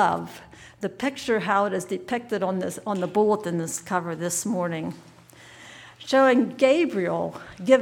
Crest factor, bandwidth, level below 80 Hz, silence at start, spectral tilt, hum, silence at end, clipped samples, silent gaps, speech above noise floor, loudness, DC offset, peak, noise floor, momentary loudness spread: 20 dB; 18 kHz; -64 dBFS; 0 s; -4.5 dB/octave; none; 0 s; under 0.1%; none; 25 dB; -24 LUFS; under 0.1%; -6 dBFS; -49 dBFS; 19 LU